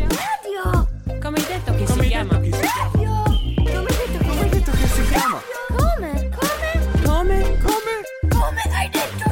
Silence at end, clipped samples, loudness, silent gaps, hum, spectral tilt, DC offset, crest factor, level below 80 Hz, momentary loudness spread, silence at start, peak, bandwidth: 0 s; under 0.1%; -21 LUFS; none; none; -5.5 dB/octave; under 0.1%; 12 dB; -22 dBFS; 5 LU; 0 s; -6 dBFS; 17.5 kHz